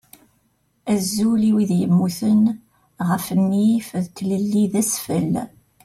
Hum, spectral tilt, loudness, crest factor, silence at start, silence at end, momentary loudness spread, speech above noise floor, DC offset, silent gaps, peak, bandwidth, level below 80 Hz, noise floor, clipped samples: none; -6 dB/octave; -20 LUFS; 12 dB; 0.85 s; 0.35 s; 9 LU; 46 dB; under 0.1%; none; -8 dBFS; 15.5 kHz; -58 dBFS; -65 dBFS; under 0.1%